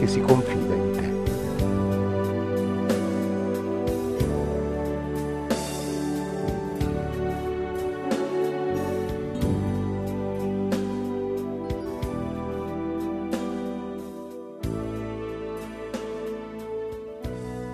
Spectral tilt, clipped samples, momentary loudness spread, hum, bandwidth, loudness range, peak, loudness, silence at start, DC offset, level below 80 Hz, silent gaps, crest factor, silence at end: -7 dB/octave; under 0.1%; 9 LU; none; 14 kHz; 7 LU; -2 dBFS; -28 LUFS; 0 s; under 0.1%; -42 dBFS; none; 24 dB; 0 s